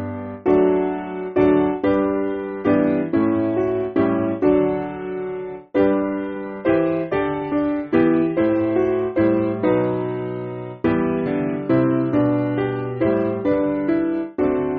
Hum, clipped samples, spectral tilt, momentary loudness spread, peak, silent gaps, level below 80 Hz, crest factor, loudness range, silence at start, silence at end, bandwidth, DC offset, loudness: none; under 0.1%; -7.5 dB/octave; 8 LU; -4 dBFS; none; -48 dBFS; 16 dB; 2 LU; 0 s; 0 s; 4.7 kHz; under 0.1%; -20 LUFS